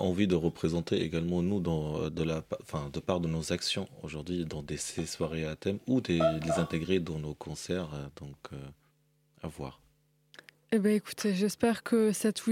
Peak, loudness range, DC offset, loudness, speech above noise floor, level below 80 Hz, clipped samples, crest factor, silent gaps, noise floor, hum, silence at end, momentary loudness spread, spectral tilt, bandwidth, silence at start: -12 dBFS; 6 LU; under 0.1%; -32 LUFS; 39 dB; -54 dBFS; under 0.1%; 18 dB; none; -70 dBFS; none; 0 s; 14 LU; -5.5 dB/octave; 16 kHz; 0 s